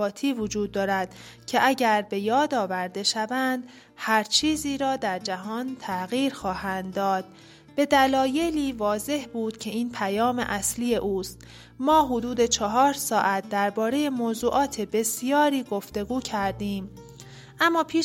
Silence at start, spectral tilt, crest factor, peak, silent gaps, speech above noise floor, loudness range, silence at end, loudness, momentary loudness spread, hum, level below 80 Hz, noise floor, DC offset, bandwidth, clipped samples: 0 s; -3.5 dB/octave; 18 dB; -8 dBFS; none; 20 dB; 3 LU; 0 s; -25 LUFS; 11 LU; none; -54 dBFS; -45 dBFS; under 0.1%; 16.5 kHz; under 0.1%